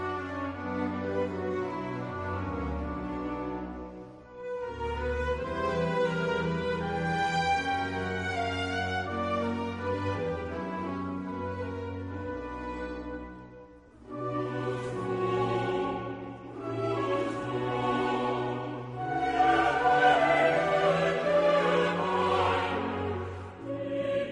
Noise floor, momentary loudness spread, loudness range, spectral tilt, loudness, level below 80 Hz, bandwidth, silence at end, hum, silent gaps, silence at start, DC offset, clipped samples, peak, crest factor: -51 dBFS; 13 LU; 11 LU; -6 dB/octave; -30 LUFS; -50 dBFS; 10.5 kHz; 0 s; none; none; 0 s; under 0.1%; under 0.1%; -10 dBFS; 20 dB